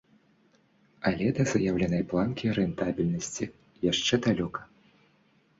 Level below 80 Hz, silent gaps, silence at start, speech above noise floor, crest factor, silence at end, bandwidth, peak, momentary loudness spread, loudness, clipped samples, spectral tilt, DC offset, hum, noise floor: -54 dBFS; none; 1 s; 38 dB; 20 dB; 0.95 s; 8 kHz; -10 dBFS; 9 LU; -28 LUFS; under 0.1%; -5 dB/octave; under 0.1%; none; -65 dBFS